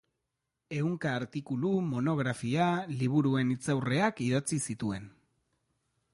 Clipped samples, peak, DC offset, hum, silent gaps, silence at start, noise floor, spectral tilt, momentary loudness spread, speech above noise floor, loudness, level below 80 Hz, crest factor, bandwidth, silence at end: under 0.1%; -14 dBFS; under 0.1%; none; none; 0.7 s; -85 dBFS; -6 dB/octave; 8 LU; 55 dB; -31 LUFS; -66 dBFS; 16 dB; 11.5 kHz; 1.05 s